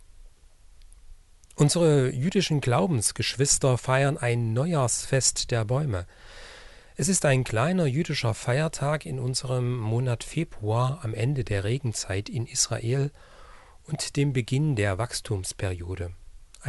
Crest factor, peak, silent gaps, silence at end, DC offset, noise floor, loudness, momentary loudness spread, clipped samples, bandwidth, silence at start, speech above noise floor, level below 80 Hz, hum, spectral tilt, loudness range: 18 dB; -8 dBFS; none; 0 s; under 0.1%; -52 dBFS; -26 LUFS; 10 LU; under 0.1%; 11.5 kHz; 0.2 s; 27 dB; -48 dBFS; none; -4.5 dB/octave; 5 LU